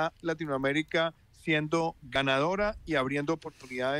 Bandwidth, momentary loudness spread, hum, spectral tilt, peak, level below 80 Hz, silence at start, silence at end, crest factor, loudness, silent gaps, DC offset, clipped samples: 12.5 kHz; 7 LU; none; -5.5 dB/octave; -14 dBFS; -54 dBFS; 0 s; 0 s; 18 dB; -30 LUFS; none; under 0.1%; under 0.1%